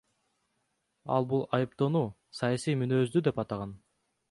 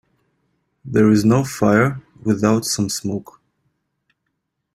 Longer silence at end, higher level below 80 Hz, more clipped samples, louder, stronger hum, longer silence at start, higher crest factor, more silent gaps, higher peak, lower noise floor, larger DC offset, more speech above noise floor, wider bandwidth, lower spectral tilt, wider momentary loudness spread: second, 0.55 s vs 1.5 s; second, -66 dBFS vs -52 dBFS; neither; second, -30 LUFS vs -18 LUFS; neither; first, 1.05 s vs 0.85 s; about the same, 18 dB vs 18 dB; neither; second, -12 dBFS vs -2 dBFS; about the same, -78 dBFS vs -75 dBFS; neither; second, 49 dB vs 58 dB; second, 11.5 kHz vs 14.5 kHz; first, -7 dB/octave vs -5.5 dB/octave; about the same, 9 LU vs 11 LU